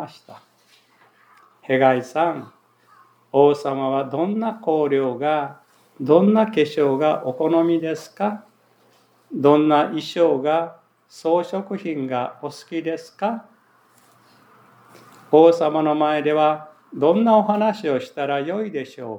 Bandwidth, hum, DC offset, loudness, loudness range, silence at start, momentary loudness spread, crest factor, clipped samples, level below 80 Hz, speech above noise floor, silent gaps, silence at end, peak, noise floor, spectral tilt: 10.5 kHz; none; under 0.1%; -20 LUFS; 8 LU; 0 s; 14 LU; 20 dB; under 0.1%; -84 dBFS; 38 dB; none; 0 s; 0 dBFS; -58 dBFS; -7 dB/octave